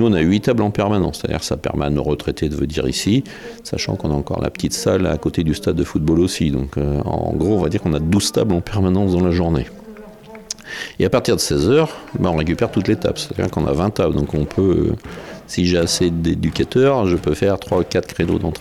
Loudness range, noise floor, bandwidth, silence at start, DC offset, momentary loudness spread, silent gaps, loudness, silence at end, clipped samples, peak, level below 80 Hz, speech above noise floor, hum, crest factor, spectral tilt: 2 LU; -38 dBFS; 15.5 kHz; 0 s; 0.2%; 7 LU; none; -18 LUFS; 0 s; under 0.1%; -4 dBFS; -36 dBFS; 20 dB; none; 14 dB; -6 dB/octave